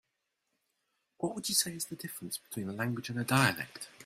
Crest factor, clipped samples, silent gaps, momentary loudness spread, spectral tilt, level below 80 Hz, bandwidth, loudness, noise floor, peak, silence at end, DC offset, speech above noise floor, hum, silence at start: 24 dB; under 0.1%; none; 12 LU; -3.5 dB/octave; -72 dBFS; 16 kHz; -33 LUFS; -83 dBFS; -10 dBFS; 0 s; under 0.1%; 49 dB; none; 1.2 s